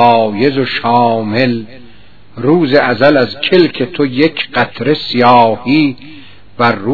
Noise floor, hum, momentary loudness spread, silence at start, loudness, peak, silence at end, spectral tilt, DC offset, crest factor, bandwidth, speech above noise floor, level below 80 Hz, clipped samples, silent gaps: -42 dBFS; none; 6 LU; 0 s; -11 LUFS; 0 dBFS; 0 s; -8 dB/octave; 2%; 12 dB; 5.4 kHz; 31 dB; -52 dBFS; 0.5%; none